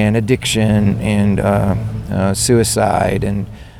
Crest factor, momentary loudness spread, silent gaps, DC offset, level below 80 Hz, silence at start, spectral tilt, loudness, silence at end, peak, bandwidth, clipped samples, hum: 14 dB; 7 LU; none; under 0.1%; -32 dBFS; 0 s; -5.5 dB/octave; -15 LUFS; 0 s; -2 dBFS; 16 kHz; under 0.1%; none